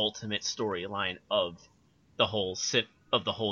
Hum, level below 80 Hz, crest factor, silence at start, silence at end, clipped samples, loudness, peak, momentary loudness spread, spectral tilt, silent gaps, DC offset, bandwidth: none; -68 dBFS; 22 dB; 0 s; 0 s; under 0.1%; -31 LUFS; -10 dBFS; 5 LU; -3 dB/octave; none; under 0.1%; 7.4 kHz